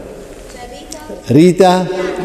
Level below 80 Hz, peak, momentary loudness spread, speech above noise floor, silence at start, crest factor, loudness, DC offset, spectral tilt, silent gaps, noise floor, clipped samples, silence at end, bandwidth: -40 dBFS; 0 dBFS; 23 LU; 21 dB; 0 s; 14 dB; -11 LUFS; under 0.1%; -6.5 dB/octave; none; -32 dBFS; 0.1%; 0 s; 14 kHz